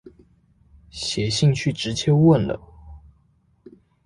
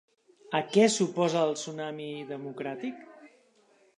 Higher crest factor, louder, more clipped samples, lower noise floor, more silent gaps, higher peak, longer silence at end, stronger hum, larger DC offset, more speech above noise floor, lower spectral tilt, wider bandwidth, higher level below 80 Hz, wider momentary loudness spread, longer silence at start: about the same, 18 dB vs 22 dB; first, -20 LUFS vs -29 LUFS; neither; about the same, -61 dBFS vs -64 dBFS; neither; first, -6 dBFS vs -10 dBFS; first, 1.1 s vs 0.7 s; neither; neither; first, 42 dB vs 36 dB; first, -6 dB/octave vs -4.5 dB/octave; about the same, 11.5 kHz vs 11 kHz; first, -48 dBFS vs -84 dBFS; about the same, 14 LU vs 15 LU; second, 0.05 s vs 0.5 s